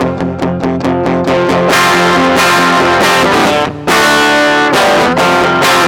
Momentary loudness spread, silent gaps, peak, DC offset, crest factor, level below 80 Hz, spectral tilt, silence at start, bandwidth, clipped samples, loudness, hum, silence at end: 6 LU; none; 0 dBFS; under 0.1%; 8 dB; -40 dBFS; -4 dB/octave; 0 s; 19.5 kHz; under 0.1%; -9 LUFS; none; 0 s